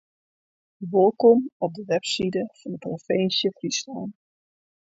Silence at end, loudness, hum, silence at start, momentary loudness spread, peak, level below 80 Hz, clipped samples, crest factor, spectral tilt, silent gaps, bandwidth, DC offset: 0.85 s; -23 LUFS; none; 0.8 s; 16 LU; -6 dBFS; -66 dBFS; under 0.1%; 20 dB; -4.5 dB/octave; 1.52-1.60 s; 8 kHz; under 0.1%